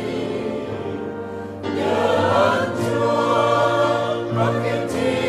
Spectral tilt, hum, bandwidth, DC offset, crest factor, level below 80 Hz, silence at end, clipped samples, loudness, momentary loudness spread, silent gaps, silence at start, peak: -6 dB/octave; none; 15 kHz; under 0.1%; 16 dB; -54 dBFS; 0 s; under 0.1%; -20 LUFS; 11 LU; none; 0 s; -4 dBFS